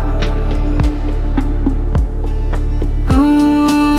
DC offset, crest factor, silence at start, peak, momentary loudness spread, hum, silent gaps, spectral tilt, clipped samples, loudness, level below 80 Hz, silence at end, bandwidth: under 0.1%; 12 dB; 0 s; -2 dBFS; 9 LU; none; none; -7 dB/octave; under 0.1%; -16 LUFS; -16 dBFS; 0 s; 13.5 kHz